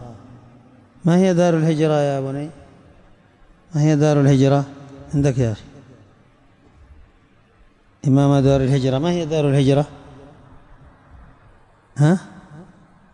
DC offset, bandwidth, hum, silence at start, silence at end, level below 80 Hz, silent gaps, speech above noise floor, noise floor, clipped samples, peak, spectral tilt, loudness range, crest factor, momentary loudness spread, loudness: under 0.1%; 9.8 kHz; none; 0 s; 0.5 s; -46 dBFS; none; 37 dB; -54 dBFS; under 0.1%; -6 dBFS; -7.5 dB/octave; 6 LU; 16 dB; 15 LU; -18 LUFS